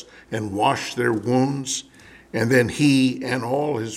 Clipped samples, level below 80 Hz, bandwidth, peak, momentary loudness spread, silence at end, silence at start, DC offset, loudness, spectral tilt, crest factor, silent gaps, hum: under 0.1%; -58 dBFS; 15 kHz; -4 dBFS; 11 LU; 0 s; 0 s; under 0.1%; -22 LUFS; -5 dB/octave; 18 dB; none; none